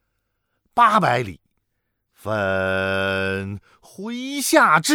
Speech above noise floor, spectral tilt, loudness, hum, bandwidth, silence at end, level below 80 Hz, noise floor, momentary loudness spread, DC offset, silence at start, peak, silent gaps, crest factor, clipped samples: 55 dB; -4 dB/octave; -20 LUFS; none; 20 kHz; 0 s; -60 dBFS; -75 dBFS; 18 LU; under 0.1%; 0.75 s; -2 dBFS; none; 20 dB; under 0.1%